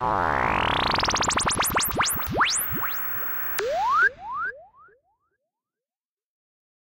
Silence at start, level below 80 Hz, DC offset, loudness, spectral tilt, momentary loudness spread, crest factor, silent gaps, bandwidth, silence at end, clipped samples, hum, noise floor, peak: 0 s; -44 dBFS; under 0.1%; -23 LUFS; -2 dB/octave; 4 LU; 14 dB; none; 17 kHz; 2.2 s; under 0.1%; none; under -90 dBFS; -12 dBFS